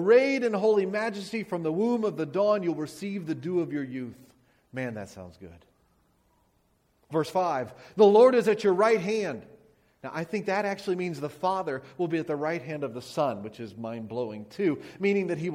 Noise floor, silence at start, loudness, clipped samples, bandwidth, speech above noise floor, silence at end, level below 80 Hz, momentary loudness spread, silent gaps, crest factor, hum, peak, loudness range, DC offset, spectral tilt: -69 dBFS; 0 s; -27 LUFS; under 0.1%; 14.5 kHz; 42 dB; 0 s; -70 dBFS; 16 LU; none; 20 dB; none; -8 dBFS; 11 LU; under 0.1%; -6.5 dB/octave